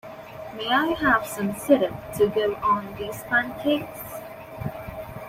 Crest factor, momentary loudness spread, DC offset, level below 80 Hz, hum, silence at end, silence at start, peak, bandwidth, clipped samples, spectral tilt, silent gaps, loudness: 20 dB; 16 LU; under 0.1%; -52 dBFS; none; 0 s; 0.05 s; -6 dBFS; 16 kHz; under 0.1%; -5 dB/octave; none; -24 LUFS